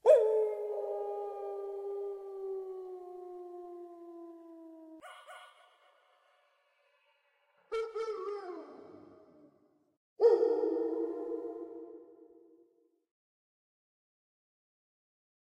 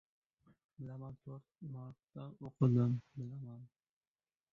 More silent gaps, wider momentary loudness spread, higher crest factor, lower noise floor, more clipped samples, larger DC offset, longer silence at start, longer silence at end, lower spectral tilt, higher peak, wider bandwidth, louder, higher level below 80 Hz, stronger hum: first, 9.97-10.16 s vs none; first, 24 LU vs 20 LU; about the same, 26 dB vs 22 dB; second, -73 dBFS vs under -90 dBFS; neither; neither; second, 0.05 s vs 0.8 s; first, 3.2 s vs 0.85 s; second, -4.5 dB/octave vs -11.5 dB/octave; first, -12 dBFS vs -18 dBFS; first, 10.5 kHz vs 4.1 kHz; first, -34 LUFS vs -38 LUFS; second, -84 dBFS vs -72 dBFS; neither